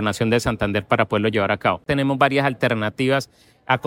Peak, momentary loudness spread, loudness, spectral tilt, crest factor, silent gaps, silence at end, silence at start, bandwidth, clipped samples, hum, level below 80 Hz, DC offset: -2 dBFS; 5 LU; -20 LUFS; -6 dB/octave; 18 dB; none; 0 s; 0 s; 16.5 kHz; under 0.1%; none; -46 dBFS; under 0.1%